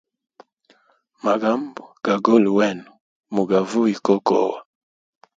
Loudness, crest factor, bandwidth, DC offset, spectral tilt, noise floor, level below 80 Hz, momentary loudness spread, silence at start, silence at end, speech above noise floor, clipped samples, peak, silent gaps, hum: -20 LUFS; 20 dB; 7.8 kHz; under 0.1%; -6.5 dB/octave; -61 dBFS; -66 dBFS; 12 LU; 1.25 s; 0.8 s; 42 dB; under 0.1%; -2 dBFS; 3.01-3.21 s; none